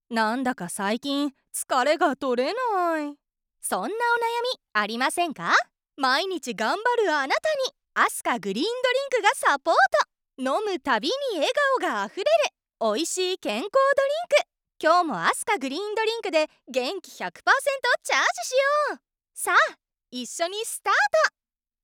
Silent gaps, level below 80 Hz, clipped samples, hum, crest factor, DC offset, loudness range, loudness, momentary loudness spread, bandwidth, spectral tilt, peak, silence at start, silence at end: none; -74 dBFS; under 0.1%; none; 18 dB; under 0.1%; 2 LU; -24 LUFS; 8 LU; 18.5 kHz; -2 dB/octave; -6 dBFS; 0.1 s; 0.55 s